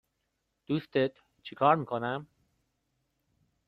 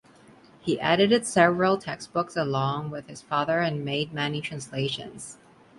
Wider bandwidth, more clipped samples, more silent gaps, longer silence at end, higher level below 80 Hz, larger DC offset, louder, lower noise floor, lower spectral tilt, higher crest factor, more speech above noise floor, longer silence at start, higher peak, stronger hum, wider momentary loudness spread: second, 5.6 kHz vs 11.5 kHz; neither; neither; first, 1.45 s vs 0.45 s; second, -72 dBFS vs -64 dBFS; neither; second, -30 LUFS vs -26 LUFS; first, -81 dBFS vs -54 dBFS; first, -8.5 dB/octave vs -5 dB/octave; about the same, 22 dB vs 22 dB; first, 51 dB vs 28 dB; about the same, 0.7 s vs 0.65 s; second, -10 dBFS vs -4 dBFS; neither; about the same, 16 LU vs 15 LU